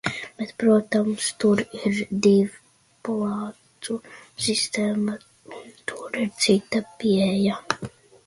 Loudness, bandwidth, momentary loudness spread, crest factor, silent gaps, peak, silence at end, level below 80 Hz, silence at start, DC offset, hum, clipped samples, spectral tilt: -24 LUFS; 11.5 kHz; 16 LU; 22 dB; none; -2 dBFS; 0.4 s; -62 dBFS; 0.05 s; under 0.1%; none; under 0.1%; -4.5 dB/octave